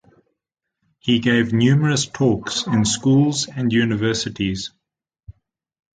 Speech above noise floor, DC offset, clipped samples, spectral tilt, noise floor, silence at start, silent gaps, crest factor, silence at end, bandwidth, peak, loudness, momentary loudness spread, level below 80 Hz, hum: 64 dB; under 0.1%; under 0.1%; -5 dB/octave; -82 dBFS; 1.05 s; none; 16 dB; 0.7 s; 9.4 kHz; -4 dBFS; -19 LUFS; 8 LU; -50 dBFS; none